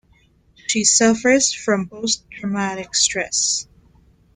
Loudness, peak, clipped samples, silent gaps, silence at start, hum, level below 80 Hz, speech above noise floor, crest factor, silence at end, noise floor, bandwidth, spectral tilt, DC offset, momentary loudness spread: -18 LUFS; -2 dBFS; under 0.1%; none; 0.7 s; none; -56 dBFS; 37 dB; 18 dB; 0.75 s; -56 dBFS; 10 kHz; -2 dB/octave; under 0.1%; 10 LU